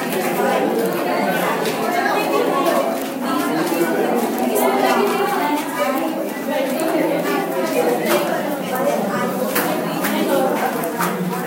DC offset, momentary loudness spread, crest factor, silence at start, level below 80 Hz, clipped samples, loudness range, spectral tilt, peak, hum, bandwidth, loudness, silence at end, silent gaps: under 0.1%; 4 LU; 16 dB; 0 s; -68 dBFS; under 0.1%; 1 LU; -4.5 dB/octave; -4 dBFS; none; 17 kHz; -19 LUFS; 0 s; none